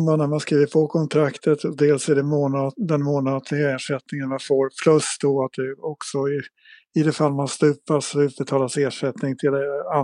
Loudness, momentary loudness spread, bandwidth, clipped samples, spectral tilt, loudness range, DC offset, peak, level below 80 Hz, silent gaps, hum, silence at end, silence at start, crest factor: -22 LUFS; 8 LU; 11 kHz; under 0.1%; -6 dB/octave; 2 LU; under 0.1%; -4 dBFS; -76 dBFS; none; none; 0 s; 0 s; 18 dB